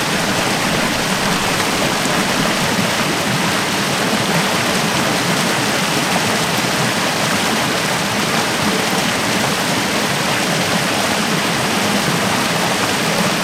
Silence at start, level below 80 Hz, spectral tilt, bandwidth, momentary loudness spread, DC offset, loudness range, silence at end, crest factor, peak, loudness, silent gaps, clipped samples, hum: 0 s; -44 dBFS; -3 dB/octave; 16 kHz; 1 LU; under 0.1%; 0 LU; 0 s; 14 dB; -2 dBFS; -16 LUFS; none; under 0.1%; none